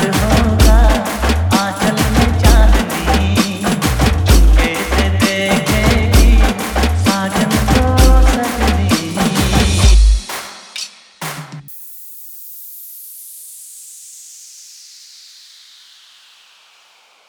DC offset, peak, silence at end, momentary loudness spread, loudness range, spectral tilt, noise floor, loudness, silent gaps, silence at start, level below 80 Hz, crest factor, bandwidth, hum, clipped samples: under 0.1%; 0 dBFS; 3.05 s; 20 LU; 18 LU; -5 dB/octave; -50 dBFS; -13 LUFS; none; 0 s; -16 dBFS; 14 dB; over 20 kHz; none; under 0.1%